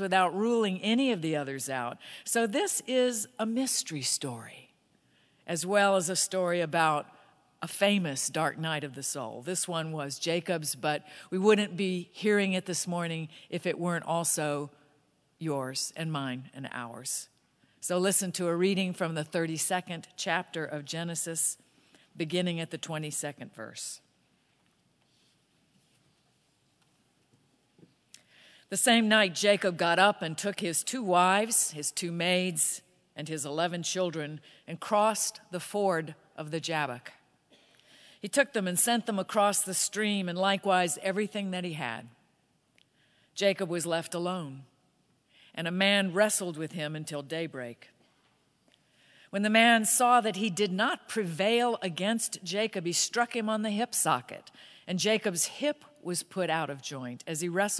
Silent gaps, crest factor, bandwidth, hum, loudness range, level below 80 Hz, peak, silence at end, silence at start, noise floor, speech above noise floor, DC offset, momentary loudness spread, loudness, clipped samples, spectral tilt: none; 24 dB; 11 kHz; none; 8 LU; -86 dBFS; -6 dBFS; 0 s; 0 s; -71 dBFS; 41 dB; under 0.1%; 14 LU; -29 LUFS; under 0.1%; -3 dB/octave